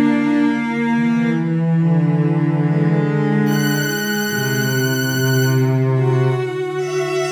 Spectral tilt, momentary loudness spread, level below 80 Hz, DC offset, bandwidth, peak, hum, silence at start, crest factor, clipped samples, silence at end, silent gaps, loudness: -6 dB/octave; 3 LU; -60 dBFS; under 0.1%; over 20 kHz; -6 dBFS; none; 0 s; 12 dB; under 0.1%; 0 s; none; -17 LUFS